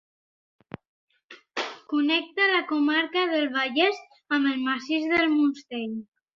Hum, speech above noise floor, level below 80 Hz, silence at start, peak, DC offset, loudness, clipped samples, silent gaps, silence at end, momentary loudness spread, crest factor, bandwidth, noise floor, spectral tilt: none; 26 dB; -70 dBFS; 1.3 s; -8 dBFS; under 0.1%; -25 LUFS; under 0.1%; none; 0.35 s; 16 LU; 18 dB; 7.2 kHz; -51 dBFS; -4 dB/octave